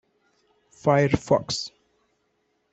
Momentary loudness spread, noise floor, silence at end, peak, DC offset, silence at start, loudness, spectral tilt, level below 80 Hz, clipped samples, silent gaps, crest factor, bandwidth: 9 LU; -71 dBFS; 1.05 s; -4 dBFS; under 0.1%; 0.85 s; -23 LUFS; -5.5 dB/octave; -52 dBFS; under 0.1%; none; 22 dB; 8.2 kHz